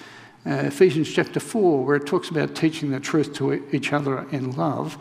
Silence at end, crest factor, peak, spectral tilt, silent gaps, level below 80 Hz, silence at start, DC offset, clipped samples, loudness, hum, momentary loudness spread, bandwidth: 0 s; 20 dB; -4 dBFS; -6 dB/octave; none; -68 dBFS; 0 s; under 0.1%; under 0.1%; -23 LUFS; none; 8 LU; 15 kHz